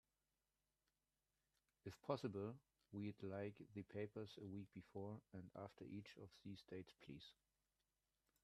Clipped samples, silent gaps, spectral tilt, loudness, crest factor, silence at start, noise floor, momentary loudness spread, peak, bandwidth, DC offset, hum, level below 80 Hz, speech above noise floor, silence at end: under 0.1%; none; -7.5 dB/octave; -55 LUFS; 26 dB; 1.85 s; under -90 dBFS; 11 LU; -30 dBFS; 13 kHz; under 0.1%; 50 Hz at -75 dBFS; -86 dBFS; over 36 dB; 1.1 s